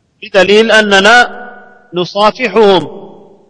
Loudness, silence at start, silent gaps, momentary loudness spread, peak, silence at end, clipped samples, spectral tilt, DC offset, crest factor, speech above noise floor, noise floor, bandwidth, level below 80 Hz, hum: -8 LUFS; 0.2 s; none; 15 LU; 0 dBFS; 0.45 s; 1%; -3.5 dB/octave; under 0.1%; 10 dB; 27 dB; -35 dBFS; 11 kHz; -44 dBFS; none